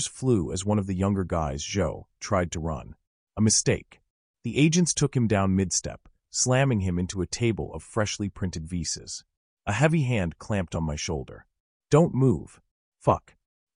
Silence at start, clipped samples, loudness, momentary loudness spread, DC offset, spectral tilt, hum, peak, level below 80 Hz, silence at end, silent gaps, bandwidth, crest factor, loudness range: 0 s; under 0.1%; -26 LUFS; 11 LU; under 0.1%; -5 dB/octave; none; -8 dBFS; -46 dBFS; 0.55 s; 3.07-3.27 s, 4.10-4.34 s, 9.37-9.57 s, 11.60-11.80 s, 12.71-12.92 s; 11 kHz; 18 dB; 4 LU